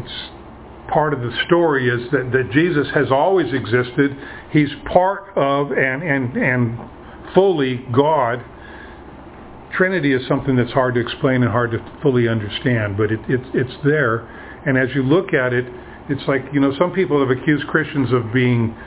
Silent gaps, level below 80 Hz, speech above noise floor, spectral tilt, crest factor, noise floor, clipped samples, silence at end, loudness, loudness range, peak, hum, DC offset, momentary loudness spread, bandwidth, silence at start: none; -44 dBFS; 20 dB; -10.5 dB/octave; 18 dB; -38 dBFS; under 0.1%; 0 s; -18 LUFS; 2 LU; 0 dBFS; none; under 0.1%; 14 LU; 4 kHz; 0 s